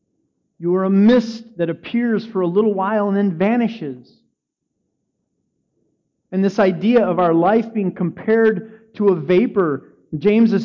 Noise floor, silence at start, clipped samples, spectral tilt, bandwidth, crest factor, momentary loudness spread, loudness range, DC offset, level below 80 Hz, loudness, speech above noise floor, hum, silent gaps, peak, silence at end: -76 dBFS; 0.6 s; under 0.1%; -8.5 dB/octave; 7 kHz; 12 dB; 12 LU; 7 LU; under 0.1%; -60 dBFS; -18 LUFS; 59 dB; none; none; -6 dBFS; 0 s